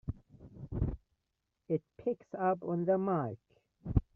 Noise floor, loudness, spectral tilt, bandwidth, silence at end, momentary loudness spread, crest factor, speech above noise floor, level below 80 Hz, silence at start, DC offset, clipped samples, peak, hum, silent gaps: -85 dBFS; -35 LUFS; -10.5 dB/octave; 3.3 kHz; 0.15 s; 20 LU; 22 dB; 52 dB; -46 dBFS; 0.05 s; under 0.1%; under 0.1%; -14 dBFS; none; none